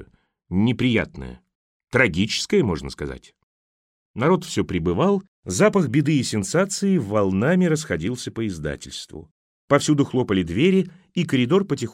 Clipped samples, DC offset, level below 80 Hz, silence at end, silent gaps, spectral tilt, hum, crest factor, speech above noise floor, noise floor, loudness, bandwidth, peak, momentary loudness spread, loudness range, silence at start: under 0.1%; under 0.1%; -48 dBFS; 0 s; 1.55-1.80 s, 3.43-4.14 s, 5.28-5.43 s, 9.31-9.68 s; -5.5 dB/octave; none; 18 dB; 31 dB; -52 dBFS; -21 LUFS; 14.5 kHz; -4 dBFS; 13 LU; 3 LU; 0 s